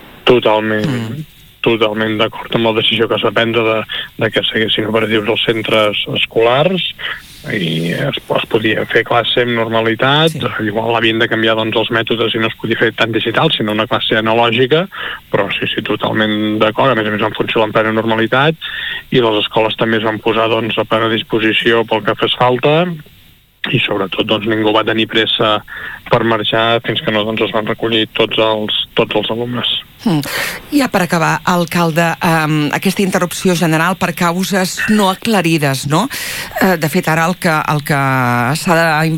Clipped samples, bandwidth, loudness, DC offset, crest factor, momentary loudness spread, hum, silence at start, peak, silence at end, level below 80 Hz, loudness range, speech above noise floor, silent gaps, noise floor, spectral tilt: under 0.1%; 19 kHz; -14 LUFS; under 0.1%; 14 dB; 5 LU; none; 0 s; 0 dBFS; 0 s; -46 dBFS; 1 LU; 30 dB; none; -44 dBFS; -5 dB/octave